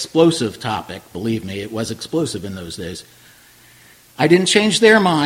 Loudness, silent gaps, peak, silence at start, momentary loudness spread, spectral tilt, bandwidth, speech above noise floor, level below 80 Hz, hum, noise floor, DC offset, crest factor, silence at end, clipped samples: -17 LUFS; none; 0 dBFS; 0 s; 18 LU; -4.5 dB/octave; 16.5 kHz; 30 dB; -54 dBFS; none; -48 dBFS; under 0.1%; 18 dB; 0 s; under 0.1%